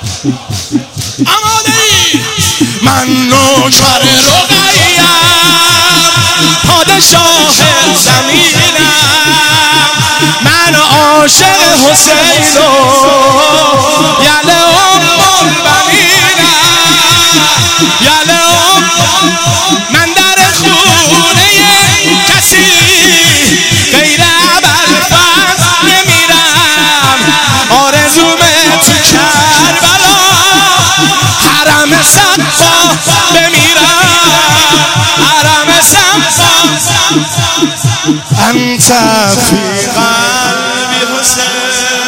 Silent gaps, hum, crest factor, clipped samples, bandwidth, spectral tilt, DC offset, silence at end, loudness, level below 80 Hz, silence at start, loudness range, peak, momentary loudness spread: none; none; 6 dB; 4%; over 20 kHz; -2 dB/octave; 0.8%; 0 s; -4 LUFS; -38 dBFS; 0 s; 3 LU; 0 dBFS; 5 LU